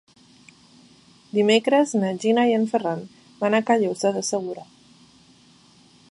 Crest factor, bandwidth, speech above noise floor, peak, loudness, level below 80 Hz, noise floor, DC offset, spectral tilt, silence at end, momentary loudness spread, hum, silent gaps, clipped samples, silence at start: 20 dB; 11.5 kHz; 33 dB; -4 dBFS; -22 LUFS; -74 dBFS; -54 dBFS; under 0.1%; -4.5 dB/octave; 1.5 s; 10 LU; none; none; under 0.1%; 1.35 s